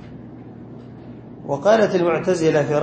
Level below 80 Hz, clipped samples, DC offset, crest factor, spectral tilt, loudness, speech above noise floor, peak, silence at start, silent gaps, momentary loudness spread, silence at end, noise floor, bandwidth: -54 dBFS; under 0.1%; under 0.1%; 18 dB; -6 dB/octave; -18 LUFS; 21 dB; -2 dBFS; 0.05 s; none; 22 LU; 0 s; -38 dBFS; 8.8 kHz